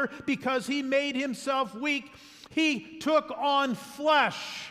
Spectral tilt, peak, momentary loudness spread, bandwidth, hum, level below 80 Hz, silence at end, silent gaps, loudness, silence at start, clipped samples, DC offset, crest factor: -3.5 dB/octave; -12 dBFS; 7 LU; 15.5 kHz; none; -70 dBFS; 0 s; none; -28 LUFS; 0 s; under 0.1%; under 0.1%; 18 dB